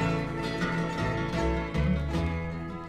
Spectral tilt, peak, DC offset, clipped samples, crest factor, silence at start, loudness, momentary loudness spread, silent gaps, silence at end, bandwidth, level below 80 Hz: -7 dB/octave; -16 dBFS; under 0.1%; under 0.1%; 14 dB; 0 s; -30 LUFS; 4 LU; none; 0 s; 12 kHz; -38 dBFS